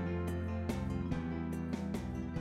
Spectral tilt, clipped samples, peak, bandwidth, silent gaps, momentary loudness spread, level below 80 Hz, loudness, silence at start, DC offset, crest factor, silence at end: -7.5 dB/octave; under 0.1%; -22 dBFS; 14 kHz; none; 2 LU; -48 dBFS; -38 LUFS; 0 s; under 0.1%; 16 dB; 0 s